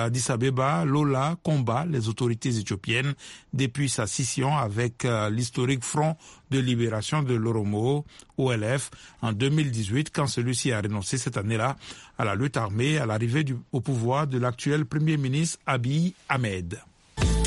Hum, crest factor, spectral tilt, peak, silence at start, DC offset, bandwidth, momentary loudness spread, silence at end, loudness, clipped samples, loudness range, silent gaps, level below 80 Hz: none; 18 dB; -5.5 dB/octave; -8 dBFS; 0 s; under 0.1%; 11.5 kHz; 6 LU; 0 s; -26 LUFS; under 0.1%; 1 LU; none; -44 dBFS